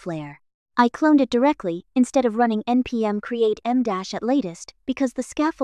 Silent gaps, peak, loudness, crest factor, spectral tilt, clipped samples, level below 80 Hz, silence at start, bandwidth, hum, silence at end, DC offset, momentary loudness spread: 0.54-0.66 s; -4 dBFS; -22 LUFS; 18 dB; -5.5 dB/octave; under 0.1%; -58 dBFS; 0.05 s; 11 kHz; none; 0 s; under 0.1%; 12 LU